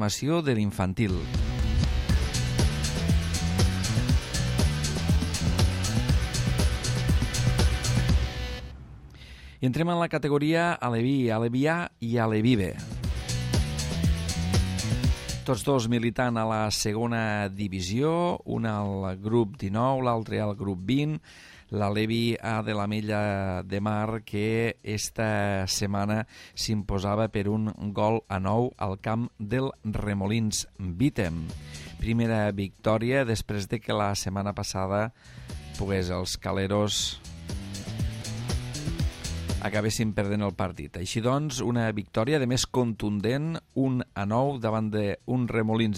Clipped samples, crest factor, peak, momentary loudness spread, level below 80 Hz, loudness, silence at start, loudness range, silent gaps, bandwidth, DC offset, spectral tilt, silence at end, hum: under 0.1%; 18 dB; -10 dBFS; 7 LU; -36 dBFS; -28 LUFS; 0 s; 4 LU; none; 16 kHz; under 0.1%; -5.5 dB/octave; 0 s; none